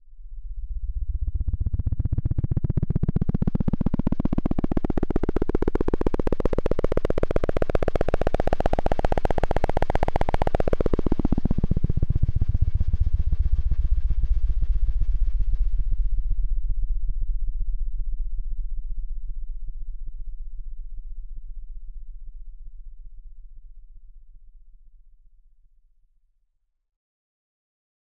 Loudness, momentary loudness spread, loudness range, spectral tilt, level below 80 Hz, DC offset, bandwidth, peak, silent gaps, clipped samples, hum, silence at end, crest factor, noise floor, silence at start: -27 LUFS; 17 LU; 17 LU; -9 dB/octave; -26 dBFS; under 0.1%; 4.4 kHz; -8 dBFS; none; under 0.1%; none; 3.5 s; 16 dB; -70 dBFS; 0.05 s